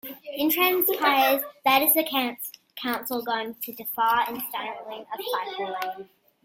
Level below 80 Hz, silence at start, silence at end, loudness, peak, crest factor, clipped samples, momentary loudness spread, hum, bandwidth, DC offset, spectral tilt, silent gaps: -72 dBFS; 0.05 s; 0.4 s; -24 LUFS; -4 dBFS; 22 dB; under 0.1%; 15 LU; none; 16.5 kHz; under 0.1%; -1.5 dB/octave; none